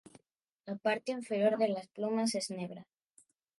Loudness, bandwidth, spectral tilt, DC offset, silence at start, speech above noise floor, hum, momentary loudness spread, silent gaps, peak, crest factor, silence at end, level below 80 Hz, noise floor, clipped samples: -34 LUFS; 11.5 kHz; -4.5 dB/octave; under 0.1%; 0.65 s; 45 dB; none; 15 LU; none; -16 dBFS; 18 dB; 0.75 s; -86 dBFS; -79 dBFS; under 0.1%